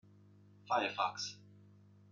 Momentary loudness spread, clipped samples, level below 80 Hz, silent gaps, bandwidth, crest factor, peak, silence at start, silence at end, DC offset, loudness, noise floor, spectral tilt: 11 LU; under 0.1%; -88 dBFS; none; 7.8 kHz; 22 dB; -20 dBFS; 0.65 s; 0.5 s; under 0.1%; -37 LUFS; -62 dBFS; -2.5 dB/octave